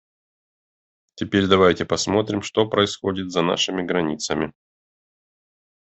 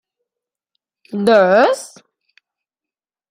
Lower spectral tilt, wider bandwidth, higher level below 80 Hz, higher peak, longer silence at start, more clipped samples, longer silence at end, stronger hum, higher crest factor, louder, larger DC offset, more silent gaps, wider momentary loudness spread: about the same, -4.5 dB/octave vs -5 dB/octave; second, 8.4 kHz vs 15.5 kHz; first, -58 dBFS vs -68 dBFS; about the same, -2 dBFS vs -2 dBFS; about the same, 1.15 s vs 1.15 s; neither; about the same, 1.4 s vs 1.45 s; neither; about the same, 22 dB vs 18 dB; second, -21 LUFS vs -14 LUFS; neither; neither; second, 9 LU vs 18 LU